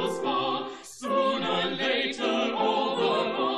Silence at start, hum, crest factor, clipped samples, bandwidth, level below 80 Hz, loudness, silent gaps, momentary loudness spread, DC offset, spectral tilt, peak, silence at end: 0 s; none; 14 dB; under 0.1%; 13 kHz; -72 dBFS; -26 LUFS; none; 4 LU; under 0.1%; -4 dB/octave; -14 dBFS; 0 s